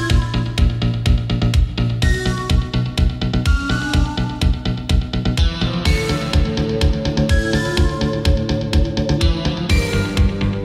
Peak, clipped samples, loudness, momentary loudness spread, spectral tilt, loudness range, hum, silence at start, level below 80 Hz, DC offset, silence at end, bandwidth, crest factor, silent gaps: -4 dBFS; under 0.1%; -18 LUFS; 2 LU; -6 dB/octave; 1 LU; none; 0 s; -20 dBFS; under 0.1%; 0 s; 14 kHz; 14 dB; none